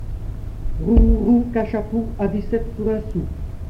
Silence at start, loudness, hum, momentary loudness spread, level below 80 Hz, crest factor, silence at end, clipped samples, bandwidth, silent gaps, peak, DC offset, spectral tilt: 0 s; -21 LUFS; none; 16 LU; -24 dBFS; 18 dB; 0 s; under 0.1%; 5.4 kHz; none; -2 dBFS; under 0.1%; -10 dB/octave